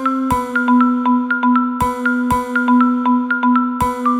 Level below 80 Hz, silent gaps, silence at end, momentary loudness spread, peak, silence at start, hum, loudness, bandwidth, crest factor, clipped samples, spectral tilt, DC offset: -40 dBFS; none; 0 s; 4 LU; -4 dBFS; 0 s; none; -15 LUFS; 14 kHz; 12 dB; under 0.1%; -6 dB/octave; under 0.1%